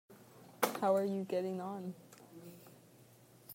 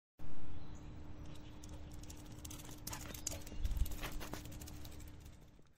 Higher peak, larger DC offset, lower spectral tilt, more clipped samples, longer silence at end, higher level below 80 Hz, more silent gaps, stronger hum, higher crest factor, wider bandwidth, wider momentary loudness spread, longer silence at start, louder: first, -14 dBFS vs -22 dBFS; neither; about the same, -5 dB/octave vs -4 dB/octave; neither; about the same, 0 s vs 0 s; second, -86 dBFS vs -48 dBFS; neither; neither; first, 26 dB vs 18 dB; about the same, 16 kHz vs 16 kHz; first, 25 LU vs 12 LU; about the same, 0.1 s vs 0.15 s; first, -37 LUFS vs -49 LUFS